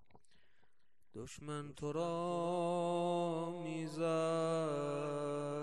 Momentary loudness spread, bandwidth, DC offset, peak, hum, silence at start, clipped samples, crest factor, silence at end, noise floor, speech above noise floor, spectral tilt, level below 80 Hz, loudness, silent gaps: 10 LU; 12 kHz; 0.1%; -26 dBFS; none; 1.15 s; under 0.1%; 14 dB; 0 s; -82 dBFS; 44 dB; -6.5 dB/octave; -74 dBFS; -38 LUFS; none